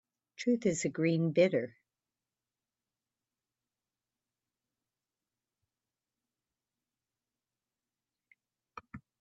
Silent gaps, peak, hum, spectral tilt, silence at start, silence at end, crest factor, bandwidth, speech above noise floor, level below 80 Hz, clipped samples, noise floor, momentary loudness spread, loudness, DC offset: none; -14 dBFS; none; -6 dB/octave; 0.4 s; 0.25 s; 24 dB; 8.2 kHz; over 60 dB; -76 dBFS; under 0.1%; under -90 dBFS; 19 LU; -31 LUFS; under 0.1%